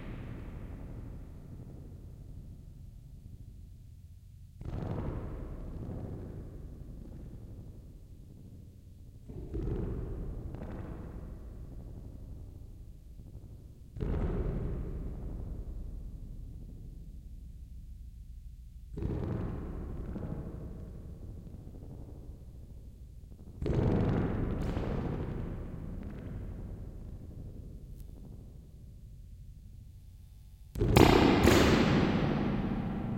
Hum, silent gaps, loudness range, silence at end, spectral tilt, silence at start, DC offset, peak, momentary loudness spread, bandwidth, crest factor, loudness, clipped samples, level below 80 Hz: none; none; 20 LU; 0 s; -6.5 dB/octave; 0 s; under 0.1%; -6 dBFS; 22 LU; 16.5 kHz; 30 dB; -33 LUFS; under 0.1%; -42 dBFS